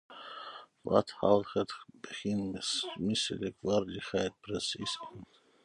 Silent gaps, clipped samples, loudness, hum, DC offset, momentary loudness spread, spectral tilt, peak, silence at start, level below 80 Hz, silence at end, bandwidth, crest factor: none; under 0.1%; -33 LUFS; none; under 0.1%; 17 LU; -4.5 dB/octave; -10 dBFS; 0.1 s; -64 dBFS; 0.4 s; 11.5 kHz; 24 dB